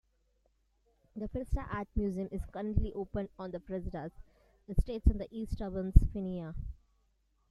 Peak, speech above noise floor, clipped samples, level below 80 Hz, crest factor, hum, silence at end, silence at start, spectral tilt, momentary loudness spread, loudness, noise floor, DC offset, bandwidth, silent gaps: -8 dBFS; 42 dB; under 0.1%; -36 dBFS; 26 dB; none; 0.75 s; 1.15 s; -9.5 dB/octave; 15 LU; -36 LUFS; -74 dBFS; under 0.1%; 11.5 kHz; none